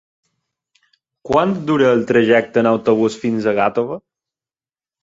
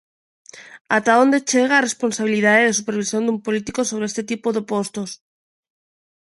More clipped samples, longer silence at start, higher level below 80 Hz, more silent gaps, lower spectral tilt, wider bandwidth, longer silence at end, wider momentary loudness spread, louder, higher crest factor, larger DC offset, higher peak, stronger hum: neither; first, 1.25 s vs 0.55 s; first, -56 dBFS vs -64 dBFS; second, none vs 0.81-0.85 s; first, -6.5 dB/octave vs -3.5 dB/octave; second, 7.8 kHz vs 11.5 kHz; second, 1.05 s vs 1.25 s; second, 6 LU vs 10 LU; first, -16 LUFS vs -19 LUFS; about the same, 16 dB vs 18 dB; neither; about the same, -2 dBFS vs -2 dBFS; neither